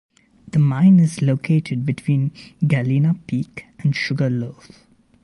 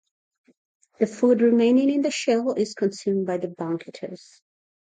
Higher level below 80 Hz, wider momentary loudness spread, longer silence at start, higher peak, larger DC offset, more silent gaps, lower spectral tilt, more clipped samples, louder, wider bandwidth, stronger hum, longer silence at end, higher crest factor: first, -56 dBFS vs -76 dBFS; second, 12 LU vs 16 LU; second, 0.55 s vs 1 s; about the same, -6 dBFS vs -8 dBFS; neither; neither; first, -7.5 dB/octave vs -5.5 dB/octave; neither; first, -19 LUFS vs -22 LUFS; first, 11.5 kHz vs 9.4 kHz; neither; about the same, 0.7 s vs 0.7 s; about the same, 14 dB vs 16 dB